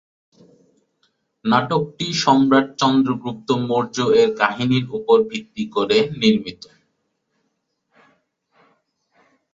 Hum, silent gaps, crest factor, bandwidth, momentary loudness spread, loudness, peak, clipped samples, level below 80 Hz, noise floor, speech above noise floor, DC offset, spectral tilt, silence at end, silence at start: none; none; 20 dB; 7.8 kHz; 9 LU; -19 LUFS; -2 dBFS; under 0.1%; -60 dBFS; -72 dBFS; 54 dB; under 0.1%; -5.5 dB/octave; 3 s; 1.45 s